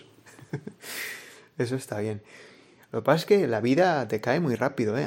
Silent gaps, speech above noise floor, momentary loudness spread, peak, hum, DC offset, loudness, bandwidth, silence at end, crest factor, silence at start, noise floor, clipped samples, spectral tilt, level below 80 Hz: none; 27 dB; 17 LU; -6 dBFS; none; under 0.1%; -26 LUFS; 16.5 kHz; 0 s; 22 dB; 0.25 s; -52 dBFS; under 0.1%; -6 dB/octave; -72 dBFS